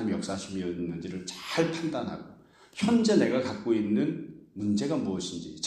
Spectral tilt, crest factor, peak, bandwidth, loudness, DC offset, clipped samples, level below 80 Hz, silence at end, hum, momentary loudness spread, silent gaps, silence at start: -5.5 dB/octave; 18 dB; -12 dBFS; 12.5 kHz; -29 LUFS; under 0.1%; under 0.1%; -64 dBFS; 0 s; none; 13 LU; none; 0 s